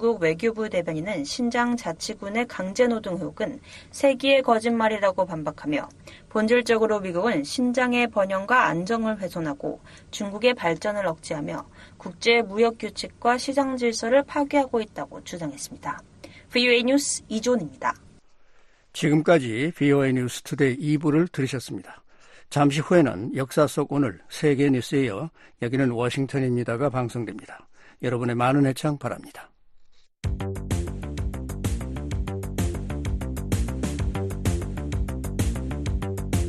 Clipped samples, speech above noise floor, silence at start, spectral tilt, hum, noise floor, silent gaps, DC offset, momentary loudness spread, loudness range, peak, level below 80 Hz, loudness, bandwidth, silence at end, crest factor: under 0.1%; 30 dB; 0 s; -5.5 dB/octave; none; -53 dBFS; none; under 0.1%; 13 LU; 6 LU; -6 dBFS; -38 dBFS; -25 LUFS; 13 kHz; 0 s; 20 dB